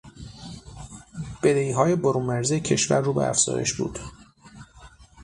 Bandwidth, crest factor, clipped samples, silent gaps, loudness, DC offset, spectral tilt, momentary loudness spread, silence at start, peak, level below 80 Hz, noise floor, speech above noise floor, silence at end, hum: 11.5 kHz; 20 dB; under 0.1%; none; -23 LUFS; under 0.1%; -4.5 dB/octave; 20 LU; 0.05 s; -6 dBFS; -50 dBFS; -49 dBFS; 27 dB; 0 s; none